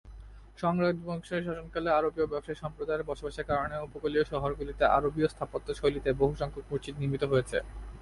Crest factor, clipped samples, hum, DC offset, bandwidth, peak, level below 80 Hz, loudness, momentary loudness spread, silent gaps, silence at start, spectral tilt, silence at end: 20 dB; under 0.1%; none; under 0.1%; 11.5 kHz; -12 dBFS; -48 dBFS; -31 LUFS; 9 LU; none; 0.05 s; -7 dB/octave; 0 s